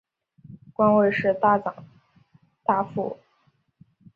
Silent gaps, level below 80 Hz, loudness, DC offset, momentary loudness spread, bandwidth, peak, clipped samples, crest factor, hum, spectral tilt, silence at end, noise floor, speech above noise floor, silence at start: none; -66 dBFS; -23 LUFS; under 0.1%; 15 LU; 5 kHz; -8 dBFS; under 0.1%; 18 dB; none; -9 dB/octave; 1 s; -67 dBFS; 45 dB; 0.5 s